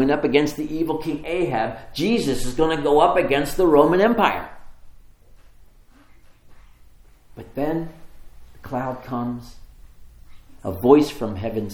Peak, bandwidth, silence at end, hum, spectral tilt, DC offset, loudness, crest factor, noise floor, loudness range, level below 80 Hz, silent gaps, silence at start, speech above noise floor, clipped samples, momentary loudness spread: 0 dBFS; 19 kHz; 0 s; none; -6 dB/octave; under 0.1%; -21 LUFS; 22 dB; -49 dBFS; 15 LU; -40 dBFS; none; 0 s; 29 dB; under 0.1%; 14 LU